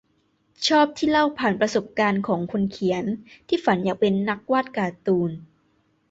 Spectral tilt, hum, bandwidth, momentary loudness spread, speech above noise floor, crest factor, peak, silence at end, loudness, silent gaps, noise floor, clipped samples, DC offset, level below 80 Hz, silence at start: -5.5 dB/octave; none; 8 kHz; 8 LU; 44 dB; 16 dB; -6 dBFS; 0.65 s; -23 LUFS; none; -66 dBFS; under 0.1%; under 0.1%; -60 dBFS; 0.6 s